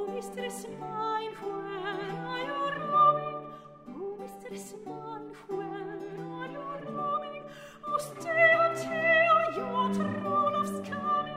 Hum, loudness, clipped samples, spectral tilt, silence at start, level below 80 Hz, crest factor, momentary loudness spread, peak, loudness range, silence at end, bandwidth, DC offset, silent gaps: none; -29 LUFS; under 0.1%; -5 dB/octave; 0 s; -68 dBFS; 18 dB; 19 LU; -12 dBFS; 13 LU; 0 s; 16 kHz; under 0.1%; none